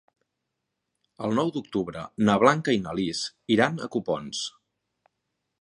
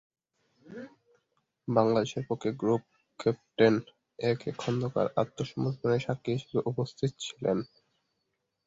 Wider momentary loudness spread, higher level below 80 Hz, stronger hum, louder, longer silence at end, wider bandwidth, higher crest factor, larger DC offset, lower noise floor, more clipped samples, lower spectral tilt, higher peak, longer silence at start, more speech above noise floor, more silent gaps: about the same, 12 LU vs 13 LU; about the same, -62 dBFS vs -66 dBFS; neither; first, -26 LUFS vs -30 LUFS; about the same, 1.1 s vs 1 s; first, 11 kHz vs 8 kHz; about the same, 24 dB vs 22 dB; neither; about the same, -82 dBFS vs -81 dBFS; neither; second, -5 dB/octave vs -6.5 dB/octave; first, -2 dBFS vs -8 dBFS; first, 1.2 s vs 0.7 s; first, 57 dB vs 52 dB; neither